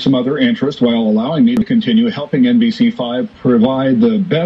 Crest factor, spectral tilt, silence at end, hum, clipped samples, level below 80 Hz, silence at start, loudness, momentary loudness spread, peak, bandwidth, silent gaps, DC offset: 10 dB; -8 dB/octave; 0 s; none; under 0.1%; -50 dBFS; 0 s; -13 LUFS; 3 LU; -2 dBFS; 6.4 kHz; none; under 0.1%